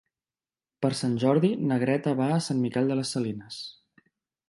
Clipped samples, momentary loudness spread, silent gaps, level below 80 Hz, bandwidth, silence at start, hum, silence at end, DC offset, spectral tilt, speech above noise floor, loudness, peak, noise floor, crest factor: under 0.1%; 13 LU; none; -70 dBFS; 11.5 kHz; 0.8 s; none; 0.75 s; under 0.1%; -6.5 dB/octave; over 64 dB; -26 LUFS; -10 dBFS; under -90 dBFS; 18 dB